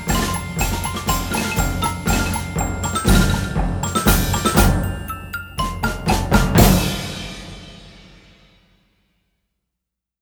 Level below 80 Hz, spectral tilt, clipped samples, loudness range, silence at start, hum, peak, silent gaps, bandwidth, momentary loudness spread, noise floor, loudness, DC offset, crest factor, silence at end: -26 dBFS; -4.5 dB/octave; under 0.1%; 4 LU; 0 s; none; 0 dBFS; none; over 20 kHz; 13 LU; -82 dBFS; -19 LUFS; under 0.1%; 20 dB; 2.25 s